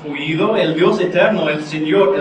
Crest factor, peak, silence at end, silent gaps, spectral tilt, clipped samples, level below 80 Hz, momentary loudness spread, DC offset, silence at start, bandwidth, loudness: 14 dB; 0 dBFS; 0 s; none; -6.5 dB/octave; under 0.1%; -60 dBFS; 5 LU; under 0.1%; 0 s; 9.4 kHz; -16 LUFS